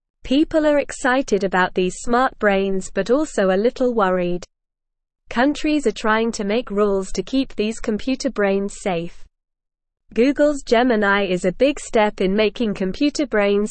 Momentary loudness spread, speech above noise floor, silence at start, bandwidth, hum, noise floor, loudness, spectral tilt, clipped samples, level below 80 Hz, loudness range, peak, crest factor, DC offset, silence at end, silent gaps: 7 LU; 60 dB; 0.25 s; 8.8 kHz; none; -79 dBFS; -20 LUFS; -5 dB/octave; under 0.1%; -40 dBFS; 4 LU; -4 dBFS; 16 dB; 0.5%; 0 s; none